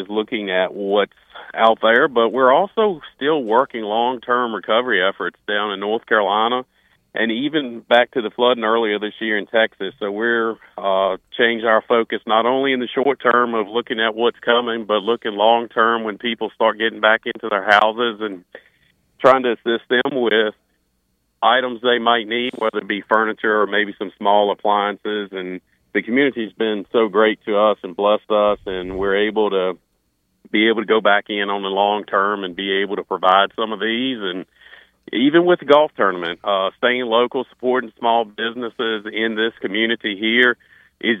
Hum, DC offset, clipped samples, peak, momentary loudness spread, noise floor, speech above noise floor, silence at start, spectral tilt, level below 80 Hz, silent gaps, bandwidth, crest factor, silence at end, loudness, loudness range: none; under 0.1%; under 0.1%; 0 dBFS; 9 LU; -67 dBFS; 49 dB; 0 s; -6 dB/octave; -60 dBFS; none; 6.8 kHz; 18 dB; 0 s; -18 LUFS; 2 LU